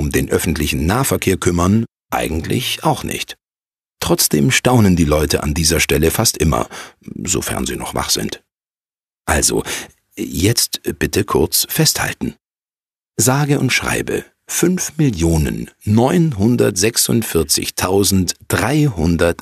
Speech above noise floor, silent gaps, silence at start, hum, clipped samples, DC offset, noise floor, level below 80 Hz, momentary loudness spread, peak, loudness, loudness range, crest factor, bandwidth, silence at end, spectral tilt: over 74 dB; none; 0 s; none; under 0.1%; under 0.1%; under -90 dBFS; -32 dBFS; 11 LU; 0 dBFS; -16 LUFS; 4 LU; 16 dB; 15 kHz; 0.1 s; -4 dB/octave